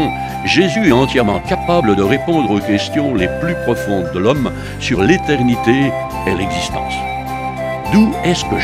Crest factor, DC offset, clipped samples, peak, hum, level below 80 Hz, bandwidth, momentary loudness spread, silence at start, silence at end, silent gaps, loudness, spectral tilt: 14 dB; under 0.1%; under 0.1%; 0 dBFS; none; -34 dBFS; 15.5 kHz; 8 LU; 0 s; 0 s; none; -15 LUFS; -5.5 dB/octave